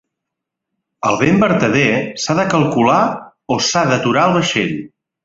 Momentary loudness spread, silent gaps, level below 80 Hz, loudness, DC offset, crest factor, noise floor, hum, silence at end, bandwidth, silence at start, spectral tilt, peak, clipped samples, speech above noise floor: 8 LU; none; -50 dBFS; -15 LUFS; under 0.1%; 16 dB; -80 dBFS; none; 0.35 s; 8 kHz; 1.05 s; -5 dB/octave; 0 dBFS; under 0.1%; 66 dB